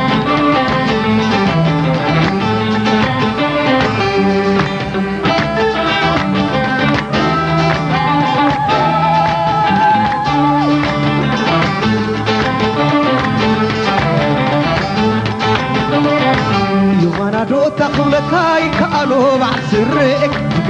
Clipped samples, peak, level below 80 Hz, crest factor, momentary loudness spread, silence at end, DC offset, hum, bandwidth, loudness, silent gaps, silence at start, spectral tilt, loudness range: under 0.1%; 0 dBFS; -36 dBFS; 14 dB; 2 LU; 0 s; under 0.1%; none; 9.6 kHz; -13 LUFS; none; 0 s; -6.5 dB/octave; 1 LU